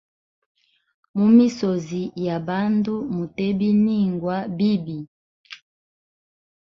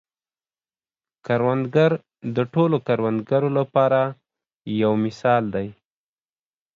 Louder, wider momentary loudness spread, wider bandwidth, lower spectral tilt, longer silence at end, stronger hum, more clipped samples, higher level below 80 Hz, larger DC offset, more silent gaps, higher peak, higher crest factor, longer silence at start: about the same, -21 LUFS vs -21 LUFS; first, 18 LU vs 10 LU; about the same, 7.2 kHz vs 7.4 kHz; about the same, -8 dB/octave vs -8.5 dB/octave; first, 1.2 s vs 1.05 s; neither; neither; about the same, -60 dBFS vs -62 dBFS; neither; first, 5.08-5.44 s vs 4.55-4.60 s; about the same, -4 dBFS vs -6 dBFS; about the same, 18 dB vs 18 dB; about the same, 1.15 s vs 1.25 s